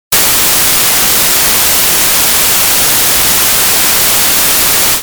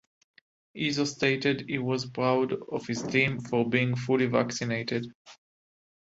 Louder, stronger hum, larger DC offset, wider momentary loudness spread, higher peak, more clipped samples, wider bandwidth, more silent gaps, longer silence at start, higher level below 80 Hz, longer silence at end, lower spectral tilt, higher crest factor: first, -5 LUFS vs -28 LUFS; neither; neither; second, 0 LU vs 8 LU; first, 0 dBFS vs -10 dBFS; first, 0.3% vs under 0.1%; first, over 20 kHz vs 8 kHz; second, none vs 5.15-5.25 s; second, 0.1 s vs 0.75 s; first, -34 dBFS vs -66 dBFS; second, 0 s vs 0.7 s; second, 0 dB/octave vs -5.5 dB/octave; second, 8 dB vs 20 dB